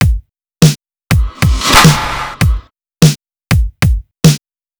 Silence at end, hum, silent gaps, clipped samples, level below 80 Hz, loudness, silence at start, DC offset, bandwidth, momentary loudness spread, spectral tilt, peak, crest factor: 0.4 s; none; none; 2%; -20 dBFS; -12 LUFS; 0 s; under 0.1%; over 20 kHz; 13 LU; -4.5 dB/octave; 0 dBFS; 12 dB